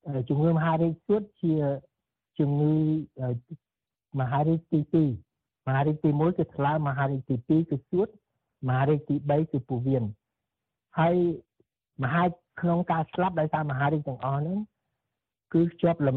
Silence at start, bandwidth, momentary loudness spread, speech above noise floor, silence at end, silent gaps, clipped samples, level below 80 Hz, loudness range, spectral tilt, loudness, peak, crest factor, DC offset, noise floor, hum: 0.05 s; 4.1 kHz; 9 LU; 61 dB; 0 s; none; under 0.1%; -62 dBFS; 2 LU; -8 dB/octave; -27 LUFS; -10 dBFS; 16 dB; under 0.1%; -87 dBFS; none